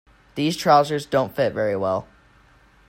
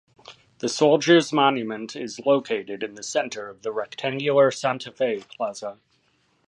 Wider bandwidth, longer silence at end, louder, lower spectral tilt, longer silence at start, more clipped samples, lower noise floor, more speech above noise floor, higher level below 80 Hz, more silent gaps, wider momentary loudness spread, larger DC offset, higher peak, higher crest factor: first, 16.5 kHz vs 11.5 kHz; about the same, 0.85 s vs 0.75 s; about the same, -21 LUFS vs -23 LUFS; about the same, -5.5 dB/octave vs -4.5 dB/octave; about the same, 0.35 s vs 0.3 s; neither; second, -54 dBFS vs -66 dBFS; second, 34 dB vs 43 dB; first, -56 dBFS vs -74 dBFS; neither; second, 9 LU vs 14 LU; neither; about the same, -4 dBFS vs -4 dBFS; about the same, 18 dB vs 20 dB